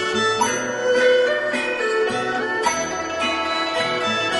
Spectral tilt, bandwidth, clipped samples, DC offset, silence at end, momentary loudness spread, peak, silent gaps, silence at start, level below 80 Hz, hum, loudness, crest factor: -2 dB/octave; 11.5 kHz; under 0.1%; under 0.1%; 0 s; 6 LU; -6 dBFS; none; 0 s; -56 dBFS; none; -20 LUFS; 14 dB